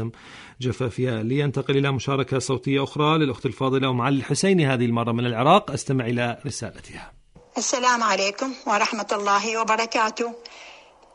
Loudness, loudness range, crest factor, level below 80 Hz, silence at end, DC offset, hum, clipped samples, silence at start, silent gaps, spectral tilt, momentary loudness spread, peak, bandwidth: -23 LUFS; 3 LU; 18 dB; -58 dBFS; 0.4 s; under 0.1%; none; under 0.1%; 0 s; none; -5 dB/octave; 14 LU; -4 dBFS; 11 kHz